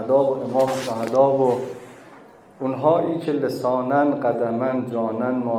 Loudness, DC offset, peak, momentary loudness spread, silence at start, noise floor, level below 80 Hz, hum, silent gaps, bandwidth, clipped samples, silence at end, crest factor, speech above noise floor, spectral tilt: -21 LUFS; under 0.1%; -6 dBFS; 8 LU; 0 s; -47 dBFS; -66 dBFS; none; none; 15 kHz; under 0.1%; 0 s; 16 dB; 26 dB; -7 dB/octave